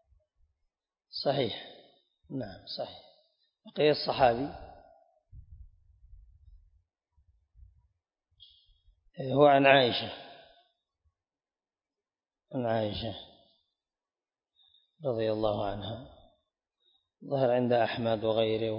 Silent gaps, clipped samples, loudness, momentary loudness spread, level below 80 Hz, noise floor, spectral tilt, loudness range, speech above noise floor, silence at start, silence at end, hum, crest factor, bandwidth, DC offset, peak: none; under 0.1%; -29 LUFS; 20 LU; -60 dBFS; under -90 dBFS; -3.5 dB/octave; 11 LU; over 62 dB; 1.15 s; 0 s; none; 26 dB; 5.4 kHz; under 0.1%; -6 dBFS